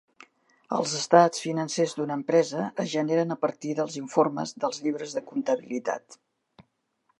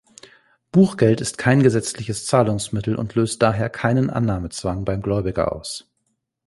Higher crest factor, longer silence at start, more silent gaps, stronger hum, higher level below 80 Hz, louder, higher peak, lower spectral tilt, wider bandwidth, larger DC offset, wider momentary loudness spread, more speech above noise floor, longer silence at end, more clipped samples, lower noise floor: first, 24 dB vs 18 dB; about the same, 0.7 s vs 0.75 s; neither; neither; second, -80 dBFS vs -44 dBFS; second, -27 LUFS vs -20 LUFS; about the same, -2 dBFS vs -2 dBFS; second, -4.5 dB/octave vs -6 dB/octave; about the same, 11.5 kHz vs 11.5 kHz; neither; about the same, 11 LU vs 10 LU; second, 47 dB vs 53 dB; about the same, 0.6 s vs 0.65 s; neither; about the same, -73 dBFS vs -73 dBFS